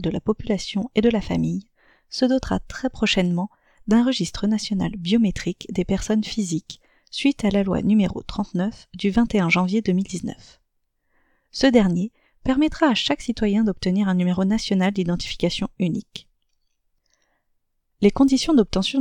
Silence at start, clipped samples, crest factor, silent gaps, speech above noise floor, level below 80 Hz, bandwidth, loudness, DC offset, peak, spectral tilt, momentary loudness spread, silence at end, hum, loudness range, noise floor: 0 s; under 0.1%; 20 dB; none; 50 dB; -42 dBFS; 11 kHz; -22 LUFS; under 0.1%; -2 dBFS; -5.5 dB/octave; 11 LU; 0 s; none; 3 LU; -71 dBFS